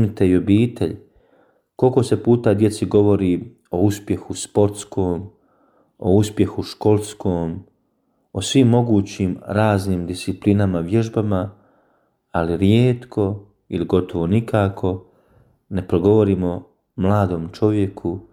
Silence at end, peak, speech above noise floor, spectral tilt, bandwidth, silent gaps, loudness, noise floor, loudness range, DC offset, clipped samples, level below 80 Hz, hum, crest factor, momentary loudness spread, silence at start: 0.1 s; -2 dBFS; 48 dB; -7 dB/octave; 14.5 kHz; none; -19 LUFS; -66 dBFS; 3 LU; under 0.1%; under 0.1%; -48 dBFS; none; 16 dB; 11 LU; 0 s